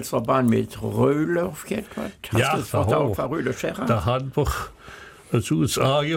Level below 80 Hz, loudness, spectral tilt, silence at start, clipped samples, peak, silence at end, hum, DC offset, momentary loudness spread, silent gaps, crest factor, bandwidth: -42 dBFS; -23 LUFS; -6 dB/octave; 0 s; under 0.1%; -8 dBFS; 0 s; none; under 0.1%; 11 LU; none; 16 dB; 17 kHz